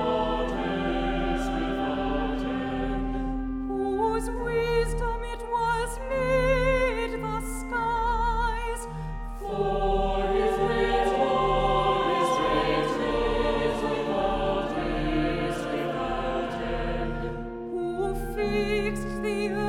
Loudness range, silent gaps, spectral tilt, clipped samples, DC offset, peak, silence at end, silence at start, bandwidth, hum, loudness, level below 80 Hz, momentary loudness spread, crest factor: 5 LU; none; -5.5 dB/octave; under 0.1%; under 0.1%; -12 dBFS; 0 s; 0 s; 15.5 kHz; none; -27 LUFS; -36 dBFS; 7 LU; 16 dB